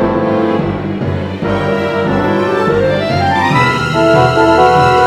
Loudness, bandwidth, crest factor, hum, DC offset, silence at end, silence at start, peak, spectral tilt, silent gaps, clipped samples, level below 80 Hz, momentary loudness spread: -12 LUFS; 14.5 kHz; 12 dB; none; under 0.1%; 0 s; 0 s; 0 dBFS; -6.5 dB/octave; none; under 0.1%; -36 dBFS; 9 LU